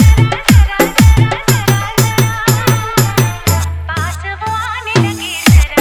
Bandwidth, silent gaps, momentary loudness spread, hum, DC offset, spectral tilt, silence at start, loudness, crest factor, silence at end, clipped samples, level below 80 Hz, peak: over 20 kHz; none; 9 LU; none; under 0.1%; -5 dB/octave; 0 s; -12 LUFS; 10 dB; 0 s; 0.5%; -18 dBFS; 0 dBFS